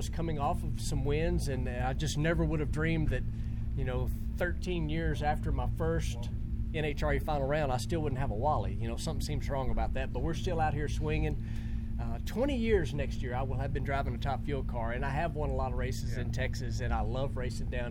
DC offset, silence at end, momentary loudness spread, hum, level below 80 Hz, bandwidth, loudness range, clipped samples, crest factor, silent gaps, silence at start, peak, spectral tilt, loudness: under 0.1%; 0 s; 5 LU; none; -36 dBFS; 16.5 kHz; 2 LU; under 0.1%; 16 dB; none; 0 s; -16 dBFS; -6.5 dB/octave; -34 LUFS